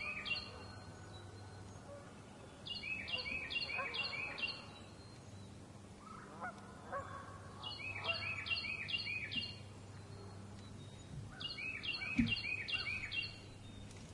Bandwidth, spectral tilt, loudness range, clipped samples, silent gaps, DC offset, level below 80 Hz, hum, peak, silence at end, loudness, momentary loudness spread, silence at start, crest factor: 11.5 kHz; -4 dB/octave; 6 LU; under 0.1%; none; under 0.1%; -64 dBFS; none; -20 dBFS; 0 s; -41 LUFS; 16 LU; 0 s; 24 dB